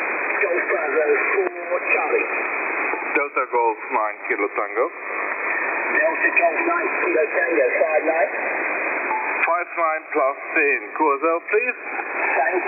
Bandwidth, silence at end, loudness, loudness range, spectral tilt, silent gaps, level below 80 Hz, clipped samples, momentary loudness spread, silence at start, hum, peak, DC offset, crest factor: 3.7 kHz; 0 s; -20 LUFS; 3 LU; -8 dB/octave; none; -84 dBFS; under 0.1%; 5 LU; 0 s; none; -6 dBFS; under 0.1%; 16 dB